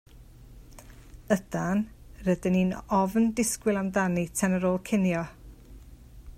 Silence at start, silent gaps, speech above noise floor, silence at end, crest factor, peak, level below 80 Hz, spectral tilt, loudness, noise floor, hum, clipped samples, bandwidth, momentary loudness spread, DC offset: 0.15 s; none; 23 dB; 0.05 s; 18 dB; -10 dBFS; -50 dBFS; -6 dB/octave; -27 LUFS; -49 dBFS; none; under 0.1%; 15.5 kHz; 5 LU; under 0.1%